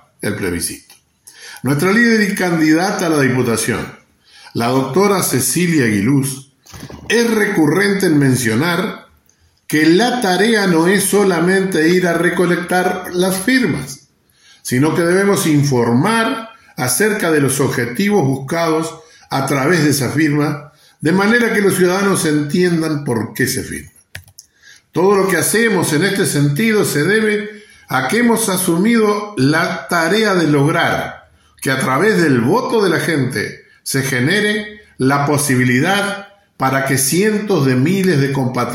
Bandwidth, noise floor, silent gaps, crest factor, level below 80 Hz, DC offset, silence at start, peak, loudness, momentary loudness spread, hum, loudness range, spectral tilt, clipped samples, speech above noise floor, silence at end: 16.5 kHz; -55 dBFS; none; 14 dB; -52 dBFS; under 0.1%; 0.2 s; 0 dBFS; -15 LUFS; 10 LU; none; 2 LU; -5 dB/octave; under 0.1%; 41 dB; 0 s